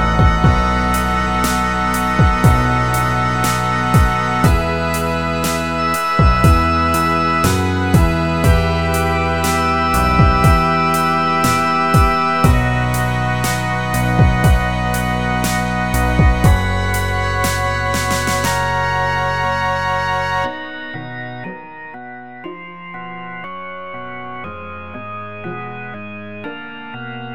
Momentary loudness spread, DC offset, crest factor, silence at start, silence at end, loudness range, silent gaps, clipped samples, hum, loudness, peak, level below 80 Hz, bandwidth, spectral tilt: 16 LU; 2%; 16 dB; 0 s; 0 s; 14 LU; none; under 0.1%; none; -15 LUFS; 0 dBFS; -24 dBFS; 19 kHz; -5.5 dB/octave